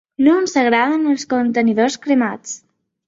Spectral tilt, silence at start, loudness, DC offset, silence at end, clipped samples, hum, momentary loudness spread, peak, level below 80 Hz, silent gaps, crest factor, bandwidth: -4 dB/octave; 0.2 s; -16 LUFS; under 0.1%; 0.5 s; under 0.1%; none; 11 LU; -2 dBFS; -60 dBFS; none; 16 dB; 7.8 kHz